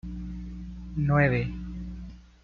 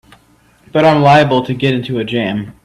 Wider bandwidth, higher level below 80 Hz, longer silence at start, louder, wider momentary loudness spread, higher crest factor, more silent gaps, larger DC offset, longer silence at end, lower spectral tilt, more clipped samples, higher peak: second, 6.2 kHz vs 12 kHz; first, -40 dBFS vs -48 dBFS; second, 0.05 s vs 0.75 s; second, -28 LUFS vs -13 LUFS; first, 18 LU vs 10 LU; first, 20 dB vs 14 dB; neither; neither; about the same, 0.2 s vs 0.15 s; first, -9.5 dB/octave vs -7 dB/octave; neither; second, -8 dBFS vs 0 dBFS